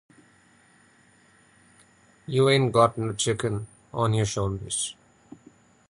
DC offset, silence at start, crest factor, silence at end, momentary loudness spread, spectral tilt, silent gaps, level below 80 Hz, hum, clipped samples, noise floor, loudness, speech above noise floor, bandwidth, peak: under 0.1%; 2.3 s; 22 dB; 0.95 s; 13 LU; -4.5 dB/octave; none; -52 dBFS; none; under 0.1%; -59 dBFS; -25 LUFS; 35 dB; 11.5 kHz; -6 dBFS